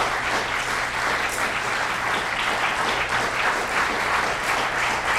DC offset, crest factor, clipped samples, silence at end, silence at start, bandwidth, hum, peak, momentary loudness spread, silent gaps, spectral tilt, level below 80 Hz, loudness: under 0.1%; 14 dB; under 0.1%; 0 s; 0 s; 16 kHz; none; -8 dBFS; 2 LU; none; -2 dB/octave; -46 dBFS; -22 LUFS